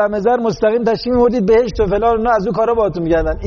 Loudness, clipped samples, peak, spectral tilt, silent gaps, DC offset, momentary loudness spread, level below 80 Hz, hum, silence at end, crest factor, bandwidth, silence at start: -15 LUFS; under 0.1%; -4 dBFS; -5.5 dB/octave; none; under 0.1%; 3 LU; -30 dBFS; none; 0 s; 10 dB; 6.8 kHz; 0 s